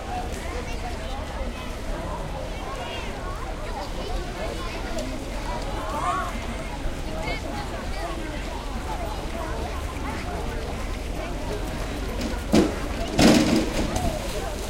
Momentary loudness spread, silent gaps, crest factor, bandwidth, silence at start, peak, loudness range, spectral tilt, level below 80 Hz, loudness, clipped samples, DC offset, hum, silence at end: 11 LU; none; 22 dB; 16.5 kHz; 0 s; -4 dBFS; 9 LU; -5 dB/octave; -32 dBFS; -28 LUFS; under 0.1%; under 0.1%; none; 0 s